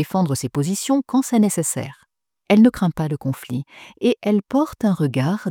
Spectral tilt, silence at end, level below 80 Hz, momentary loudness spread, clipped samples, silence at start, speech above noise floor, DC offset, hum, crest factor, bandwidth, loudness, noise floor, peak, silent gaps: -6 dB/octave; 0 s; -54 dBFS; 12 LU; under 0.1%; 0 s; 44 dB; under 0.1%; none; 16 dB; 18.5 kHz; -20 LUFS; -63 dBFS; -4 dBFS; none